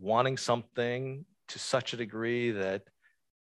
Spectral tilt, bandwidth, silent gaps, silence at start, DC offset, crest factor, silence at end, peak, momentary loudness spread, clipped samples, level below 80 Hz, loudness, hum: -4.5 dB/octave; 12 kHz; none; 0 s; under 0.1%; 22 dB; 0.65 s; -12 dBFS; 11 LU; under 0.1%; -70 dBFS; -32 LUFS; none